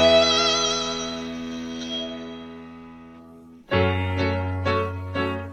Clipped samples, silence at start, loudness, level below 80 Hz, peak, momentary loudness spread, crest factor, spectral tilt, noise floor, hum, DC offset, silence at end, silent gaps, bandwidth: under 0.1%; 0 s; -23 LUFS; -48 dBFS; -6 dBFS; 22 LU; 18 dB; -4 dB/octave; -46 dBFS; none; under 0.1%; 0 s; none; 9.2 kHz